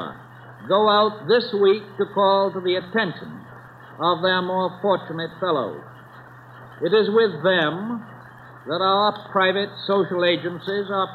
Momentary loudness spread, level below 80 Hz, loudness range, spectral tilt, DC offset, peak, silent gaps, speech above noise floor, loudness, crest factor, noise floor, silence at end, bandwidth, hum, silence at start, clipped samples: 14 LU; -68 dBFS; 4 LU; -7.5 dB/octave; under 0.1%; -6 dBFS; none; 23 dB; -21 LUFS; 16 dB; -44 dBFS; 0 s; 5.2 kHz; none; 0 s; under 0.1%